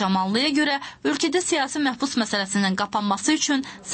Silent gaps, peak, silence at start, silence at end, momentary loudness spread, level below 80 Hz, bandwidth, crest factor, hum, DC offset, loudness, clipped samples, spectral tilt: none; -10 dBFS; 0 s; 0 s; 4 LU; -62 dBFS; 8.8 kHz; 14 dB; none; under 0.1%; -22 LUFS; under 0.1%; -3 dB/octave